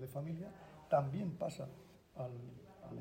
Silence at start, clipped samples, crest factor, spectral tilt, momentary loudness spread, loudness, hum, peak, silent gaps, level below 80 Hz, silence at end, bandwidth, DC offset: 0 s; under 0.1%; 22 dB; -8 dB/octave; 20 LU; -42 LUFS; none; -20 dBFS; none; -72 dBFS; 0 s; 16 kHz; under 0.1%